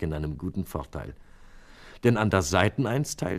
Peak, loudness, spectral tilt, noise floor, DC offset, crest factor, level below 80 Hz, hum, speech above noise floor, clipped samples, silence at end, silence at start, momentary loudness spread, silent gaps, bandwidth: -4 dBFS; -26 LUFS; -5.5 dB/octave; -48 dBFS; under 0.1%; 24 dB; -44 dBFS; none; 22 dB; under 0.1%; 0 s; 0 s; 15 LU; none; 15.5 kHz